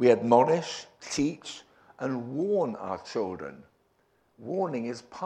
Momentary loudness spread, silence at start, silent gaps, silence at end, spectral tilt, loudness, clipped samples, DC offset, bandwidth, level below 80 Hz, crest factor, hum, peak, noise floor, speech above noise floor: 19 LU; 0 s; none; 0 s; -5.5 dB/octave; -28 LUFS; under 0.1%; under 0.1%; 10 kHz; -66 dBFS; 22 dB; none; -8 dBFS; -69 dBFS; 41 dB